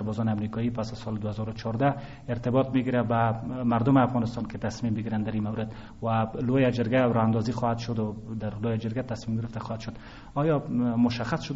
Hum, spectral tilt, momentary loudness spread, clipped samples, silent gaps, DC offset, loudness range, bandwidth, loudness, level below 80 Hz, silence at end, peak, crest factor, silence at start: none; -7 dB/octave; 11 LU; under 0.1%; none; under 0.1%; 4 LU; 7.8 kHz; -28 LUFS; -50 dBFS; 0 s; -8 dBFS; 18 dB; 0 s